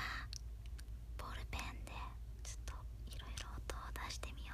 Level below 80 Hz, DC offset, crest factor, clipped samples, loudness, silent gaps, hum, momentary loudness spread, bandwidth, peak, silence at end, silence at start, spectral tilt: -48 dBFS; under 0.1%; 24 dB; under 0.1%; -49 LUFS; none; none; 6 LU; 15.5 kHz; -22 dBFS; 0 s; 0 s; -3.5 dB/octave